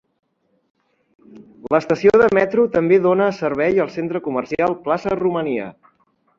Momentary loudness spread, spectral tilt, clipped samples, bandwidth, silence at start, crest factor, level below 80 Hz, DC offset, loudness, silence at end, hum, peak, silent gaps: 10 LU; -7.5 dB/octave; under 0.1%; 7.4 kHz; 1.35 s; 16 dB; -54 dBFS; under 0.1%; -18 LUFS; 0.65 s; none; -2 dBFS; none